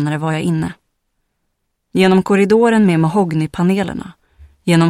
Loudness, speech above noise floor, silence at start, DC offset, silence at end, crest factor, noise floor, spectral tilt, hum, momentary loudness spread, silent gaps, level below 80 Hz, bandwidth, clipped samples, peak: -15 LUFS; 56 dB; 0 s; under 0.1%; 0 s; 14 dB; -70 dBFS; -7 dB/octave; none; 12 LU; none; -48 dBFS; 14 kHz; under 0.1%; 0 dBFS